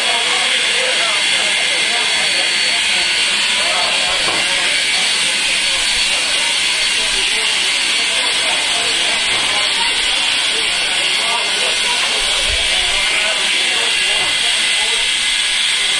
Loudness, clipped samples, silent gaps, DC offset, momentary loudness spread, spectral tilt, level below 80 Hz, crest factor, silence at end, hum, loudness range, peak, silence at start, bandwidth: -13 LUFS; under 0.1%; none; under 0.1%; 1 LU; 1.5 dB/octave; -42 dBFS; 14 dB; 0 s; none; 1 LU; -2 dBFS; 0 s; 11.5 kHz